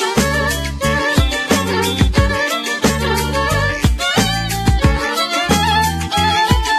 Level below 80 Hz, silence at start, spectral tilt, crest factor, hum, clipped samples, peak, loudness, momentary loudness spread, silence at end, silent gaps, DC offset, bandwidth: -24 dBFS; 0 s; -4 dB/octave; 16 dB; none; under 0.1%; 0 dBFS; -16 LUFS; 3 LU; 0 s; none; under 0.1%; 14 kHz